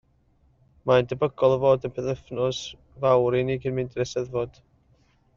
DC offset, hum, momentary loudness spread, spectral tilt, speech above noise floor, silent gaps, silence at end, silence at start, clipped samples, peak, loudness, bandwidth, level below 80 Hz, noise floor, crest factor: under 0.1%; none; 10 LU; -5.5 dB/octave; 39 dB; none; 0.85 s; 0.85 s; under 0.1%; -6 dBFS; -25 LUFS; 7.4 kHz; -54 dBFS; -63 dBFS; 20 dB